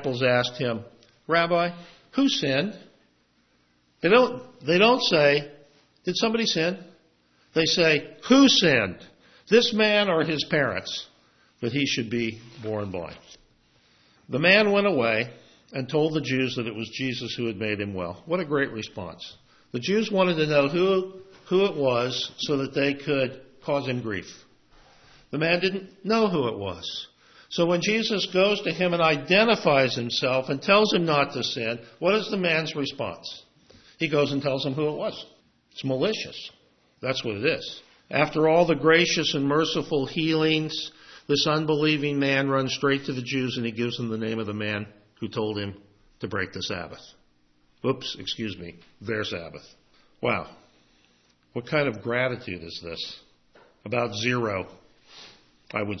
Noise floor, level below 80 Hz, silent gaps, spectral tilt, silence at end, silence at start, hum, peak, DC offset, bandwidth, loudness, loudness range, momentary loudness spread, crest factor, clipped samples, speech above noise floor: -65 dBFS; -62 dBFS; none; -4.5 dB/octave; 0 s; 0 s; none; -4 dBFS; under 0.1%; 6.4 kHz; -24 LUFS; 9 LU; 16 LU; 22 dB; under 0.1%; 41 dB